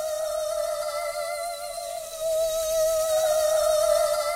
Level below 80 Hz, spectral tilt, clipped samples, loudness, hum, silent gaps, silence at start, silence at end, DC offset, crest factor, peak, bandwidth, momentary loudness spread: -54 dBFS; 0 dB/octave; under 0.1%; -25 LUFS; none; none; 0 s; 0 s; under 0.1%; 14 dB; -10 dBFS; 16 kHz; 10 LU